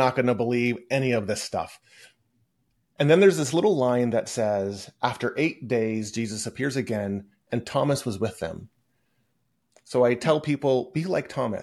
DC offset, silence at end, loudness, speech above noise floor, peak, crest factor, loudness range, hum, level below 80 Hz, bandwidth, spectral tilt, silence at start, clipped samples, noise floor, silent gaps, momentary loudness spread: under 0.1%; 0 s; -25 LUFS; 49 dB; -6 dBFS; 20 dB; 6 LU; none; -64 dBFS; 12.5 kHz; -5.5 dB/octave; 0 s; under 0.1%; -74 dBFS; none; 11 LU